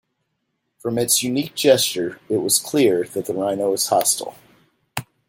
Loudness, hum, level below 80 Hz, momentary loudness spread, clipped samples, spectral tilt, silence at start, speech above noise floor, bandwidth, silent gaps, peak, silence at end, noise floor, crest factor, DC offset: -19 LUFS; none; -64 dBFS; 15 LU; under 0.1%; -3 dB/octave; 0.85 s; 54 dB; 17 kHz; none; -2 dBFS; 0.25 s; -74 dBFS; 20 dB; under 0.1%